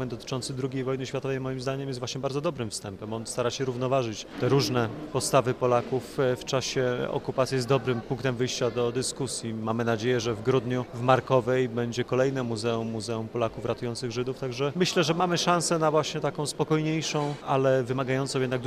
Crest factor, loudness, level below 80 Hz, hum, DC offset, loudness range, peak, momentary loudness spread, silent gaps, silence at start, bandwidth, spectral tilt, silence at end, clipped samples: 20 dB; -27 LUFS; -58 dBFS; none; under 0.1%; 4 LU; -6 dBFS; 8 LU; none; 0 s; 15.5 kHz; -5 dB/octave; 0 s; under 0.1%